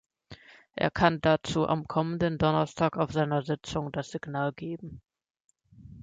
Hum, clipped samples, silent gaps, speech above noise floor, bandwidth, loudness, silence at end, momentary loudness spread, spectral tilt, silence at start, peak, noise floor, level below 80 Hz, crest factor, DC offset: none; under 0.1%; 5.30-5.34 s, 5.44-5.49 s; 24 dB; 9 kHz; -28 LUFS; 0 s; 12 LU; -6.5 dB/octave; 0.3 s; -8 dBFS; -52 dBFS; -54 dBFS; 20 dB; under 0.1%